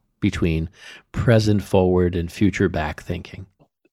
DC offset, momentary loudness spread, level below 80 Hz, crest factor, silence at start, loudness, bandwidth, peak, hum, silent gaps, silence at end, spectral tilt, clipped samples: under 0.1%; 15 LU; -38 dBFS; 20 dB; 0.2 s; -21 LUFS; 13.5 kHz; -2 dBFS; none; none; 0.5 s; -7 dB/octave; under 0.1%